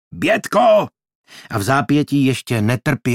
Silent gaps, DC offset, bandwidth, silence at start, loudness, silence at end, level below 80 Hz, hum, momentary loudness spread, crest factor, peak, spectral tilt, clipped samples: 1.15-1.24 s; under 0.1%; 16.5 kHz; 0.15 s; -17 LUFS; 0 s; -54 dBFS; none; 8 LU; 16 dB; -2 dBFS; -6 dB/octave; under 0.1%